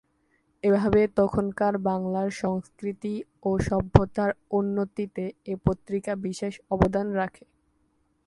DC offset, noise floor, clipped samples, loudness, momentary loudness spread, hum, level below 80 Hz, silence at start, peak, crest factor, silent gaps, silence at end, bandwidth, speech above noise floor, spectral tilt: under 0.1%; -69 dBFS; under 0.1%; -26 LUFS; 11 LU; none; -42 dBFS; 0.65 s; 0 dBFS; 26 dB; none; 0.95 s; 11.5 kHz; 44 dB; -8 dB/octave